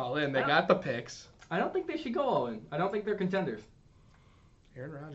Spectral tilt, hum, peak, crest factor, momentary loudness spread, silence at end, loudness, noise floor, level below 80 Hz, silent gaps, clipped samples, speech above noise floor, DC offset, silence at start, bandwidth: -6 dB/octave; none; -10 dBFS; 22 dB; 18 LU; 0 s; -31 LUFS; -61 dBFS; -64 dBFS; none; under 0.1%; 29 dB; under 0.1%; 0 s; 8 kHz